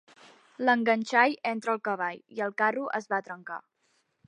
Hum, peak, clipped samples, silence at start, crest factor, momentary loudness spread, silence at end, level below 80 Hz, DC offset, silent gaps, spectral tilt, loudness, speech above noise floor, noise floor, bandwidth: none; -8 dBFS; under 0.1%; 0.6 s; 22 dB; 14 LU; 0.7 s; -84 dBFS; under 0.1%; none; -4.5 dB/octave; -28 LUFS; 44 dB; -73 dBFS; 10.5 kHz